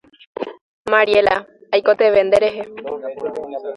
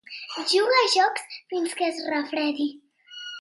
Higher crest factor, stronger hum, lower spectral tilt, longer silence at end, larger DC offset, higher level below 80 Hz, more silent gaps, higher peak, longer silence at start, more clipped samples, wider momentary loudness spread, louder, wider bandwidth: about the same, 18 dB vs 18 dB; neither; first, -4.5 dB/octave vs -0.5 dB/octave; about the same, 0 s vs 0 s; neither; first, -54 dBFS vs -84 dBFS; first, 0.61-0.85 s vs none; first, 0 dBFS vs -8 dBFS; first, 0.4 s vs 0.1 s; neither; about the same, 16 LU vs 16 LU; first, -17 LUFS vs -24 LUFS; about the same, 11 kHz vs 11.5 kHz